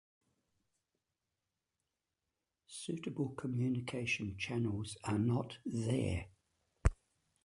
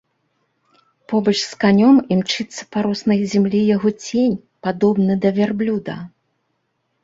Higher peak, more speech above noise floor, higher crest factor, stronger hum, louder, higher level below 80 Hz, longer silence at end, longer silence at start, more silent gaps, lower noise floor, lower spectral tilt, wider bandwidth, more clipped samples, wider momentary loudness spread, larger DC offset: second, -14 dBFS vs -2 dBFS; about the same, 52 dB vs 53 dB; first, 26 dB vs 16 dB; neither; second, -38 LUFS vs -18 LUFS; first, -50 dBFS vs -58 dBFS; second, 0.5 s vs 0.95 s; first, 2.7 s vs 1.1 s; neither; first, -89 dBFS vs -70 dBFS; about the same, -6 dB/octave vs -6 dB/octave; first, 11.5 kHz vs 7.8 kHz; neither; second, 7 LU vs 11 LU; neither